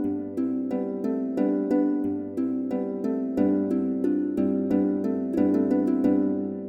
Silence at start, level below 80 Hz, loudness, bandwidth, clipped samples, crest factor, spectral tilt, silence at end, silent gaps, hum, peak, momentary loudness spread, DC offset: 0 s; -62 dBFS; -25 LUFS; 5.2 kHz; under 0.1%; 14 dB; -10 dB/octave; 0 s; none; none; -10 dBFS; 6 LU; under 0.1%